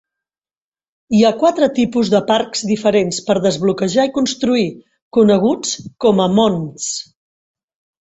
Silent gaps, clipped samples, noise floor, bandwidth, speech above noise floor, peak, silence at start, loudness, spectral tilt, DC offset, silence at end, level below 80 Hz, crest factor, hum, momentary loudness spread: 5.02-5.11 s; under 0.1%; under -90 dBFS; 8.2 kHz; over 75 dB; -2 dBFS; 1.1 s; -16 LUFS; -5 dB/octave; under 0.1%; 1 s; -54 dBFS; 14 dB; none; 9 LU